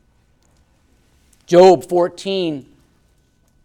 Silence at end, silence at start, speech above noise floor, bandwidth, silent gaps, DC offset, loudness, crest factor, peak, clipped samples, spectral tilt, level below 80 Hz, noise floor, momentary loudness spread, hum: 1.05 s; 1.5 s; 45 dB; 12.5 kHz; none; under 0.1%; -14 LUFS; 18 dB; 0 dBFS; under 0.1%; -6 dB/octave; -56 dBFS; -58 dBFS; 14 LU; none